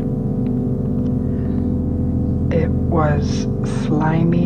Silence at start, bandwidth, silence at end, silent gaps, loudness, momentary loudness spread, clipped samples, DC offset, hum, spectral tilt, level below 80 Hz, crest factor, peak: 0 s; 9 kHz; 0 s; none; -19 LUFS; 4 LU; under 0.1%; under 0.1%; none; -8.5 dB/octave; -30 dBFS; 14 dB; -4 dBFS